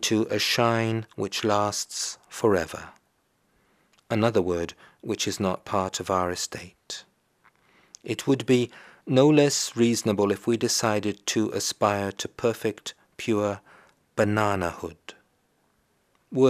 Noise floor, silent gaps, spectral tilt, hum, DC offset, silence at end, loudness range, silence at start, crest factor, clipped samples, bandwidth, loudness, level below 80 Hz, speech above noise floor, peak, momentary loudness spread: -69 dBFS; none; -4.5 dB/octave; none; under 0.1%; 0 s; 7 LU; 0 s; 22 dB; under 0.1%; 15.5 kHz; -25 LUFS; -62 dBFS; 44 dB; -4 dBFS; 16 LU